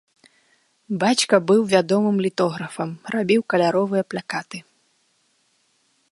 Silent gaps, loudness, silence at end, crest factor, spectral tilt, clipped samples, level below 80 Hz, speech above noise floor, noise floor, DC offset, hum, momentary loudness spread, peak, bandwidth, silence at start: none; -21 LUFS; 1.5 s; 20 dB; -5 dB/octave; under 0.1%; -68 dBFS; 45 dB; -65 dBFS; under 0.1%; none; 13 LU; -2 dBFS; 11.5 kHz; 0.9 s